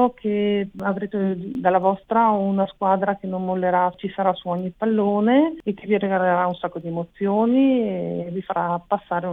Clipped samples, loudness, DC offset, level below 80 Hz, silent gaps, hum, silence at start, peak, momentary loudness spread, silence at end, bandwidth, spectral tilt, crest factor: under 0.1%; -22 LUFS; under 0.1%; -58 dBFS; none; none; 0 s; -4 dBFS; 8 LU; 0 s; 4 kHz; -10 dB/octave; 16 dB